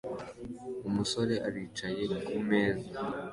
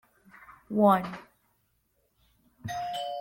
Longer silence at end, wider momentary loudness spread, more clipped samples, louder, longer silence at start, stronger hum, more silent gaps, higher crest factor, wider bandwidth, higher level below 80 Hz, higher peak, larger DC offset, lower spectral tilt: about the same, 0 s vs 0 s; second, 12 LU vs 20 LU; neither; second, -33 LUFS vs -27 LUFS; second, 0.05 s vs 0.5 s; neither; neither; about the same, 18 dB vs 20 dB; second, 11.5 kHz vs 16.5 kHz; first, -60 dBFS vs -66 dBFS; second, -14 dBFS vs -10 dBFS; neither; second, -5 dB/octave vs -6.5 dB/octave